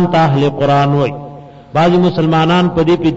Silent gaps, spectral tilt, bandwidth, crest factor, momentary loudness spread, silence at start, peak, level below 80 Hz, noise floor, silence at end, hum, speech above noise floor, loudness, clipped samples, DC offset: none; -7.5 dB/octave; 7.8 kHz; 8 dB; 8 LU; 0 s; -4 dBFS; -40 dBFS; -32 dBFS; 0 s; none; 21 dB; -12 LUFS; under 0.1%; under 0.1%